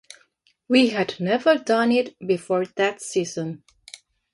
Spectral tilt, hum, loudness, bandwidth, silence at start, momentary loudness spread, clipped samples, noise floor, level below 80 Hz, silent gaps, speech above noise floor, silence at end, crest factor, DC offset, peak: -4.5 dB/octave; none; -22 LUFS; 11.5 kHz; 0.7 s; 10 LU; under 0.1%; -64 dBFS; -68 dBFS; none; 42 dB; 0.75 s; 18 dB; under 0.1%; -4 dBFS